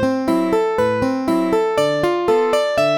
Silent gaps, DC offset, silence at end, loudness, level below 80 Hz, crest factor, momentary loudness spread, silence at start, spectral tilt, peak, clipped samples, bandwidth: none; 0.1%; 0 s; -18 LUFS; -48 dBFS; 12 dB; 2 LU; 0 s; -5.5 dB/octave; -4 dBFS; under 0.1%; 18 kHz